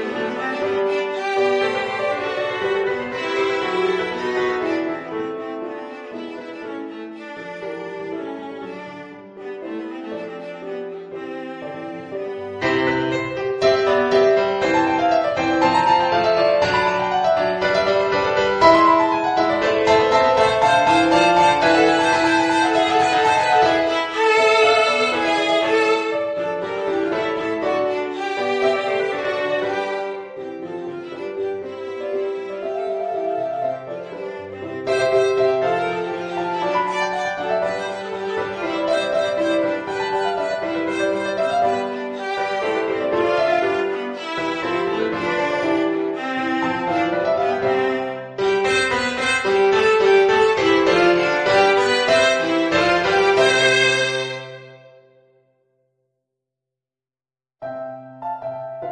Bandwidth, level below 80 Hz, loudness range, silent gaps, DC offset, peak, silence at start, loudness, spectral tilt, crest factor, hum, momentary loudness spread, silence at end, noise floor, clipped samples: 10 kHz; -54 dBFS; 15 LU; none; under 0.1%; 0 dBFS; 0 s; -19 LUFS; -4 dB/octave; 20 dB; none; 16 LU; 0 s; under -90 dBFS; under 0.1%